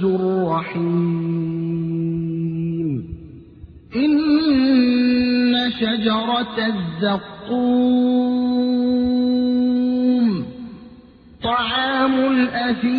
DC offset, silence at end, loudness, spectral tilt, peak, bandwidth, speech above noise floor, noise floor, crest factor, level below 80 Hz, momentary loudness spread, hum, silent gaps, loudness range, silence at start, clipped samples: under 0.1%; 0 s; -19 LUFS; -9.5 dB/octave; -6 dBFS; 5 kHz; 26 dB; -45 dBFS; 14 dB; -50 dBFS; 8 LU; none; none; 5 LU; 0 s; under 0.1%